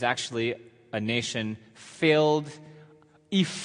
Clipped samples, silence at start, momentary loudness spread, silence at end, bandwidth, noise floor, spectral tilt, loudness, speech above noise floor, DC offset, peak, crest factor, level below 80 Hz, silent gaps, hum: under 0.1%; 0 s; 19 LU; 0 s; 10.5 kHz; -56 dBFS; -4.5 dB/octave; -27 LUFS; 29 dB; under 0.1%; -8 dBFS; 20 dB; -70 dBFS; none; none